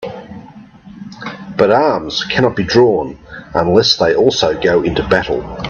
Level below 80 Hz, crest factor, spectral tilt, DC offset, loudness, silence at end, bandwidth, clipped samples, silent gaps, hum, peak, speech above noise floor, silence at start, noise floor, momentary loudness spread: -40 dBFS; 14 dB; -5 dB/octave; under 0.1%; -13 LUFS; 0 s; 7.4 kHz; under 0.1%; none; none; 0 dBFS; 24 dB; 0 s; -37 dBFS; 21 LU